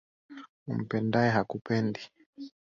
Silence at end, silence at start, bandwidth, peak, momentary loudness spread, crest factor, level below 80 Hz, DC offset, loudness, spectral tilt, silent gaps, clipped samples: 0.3 s; 0.3 s; 7.4 kHz; -12 dBFS; 23 LU; 20 dB; -66 dBFS; under 0.1%; -29 LUFS; -7.5 dB/octave; 0.49-0.66 s, 2.26-2.33 s; under 0.1%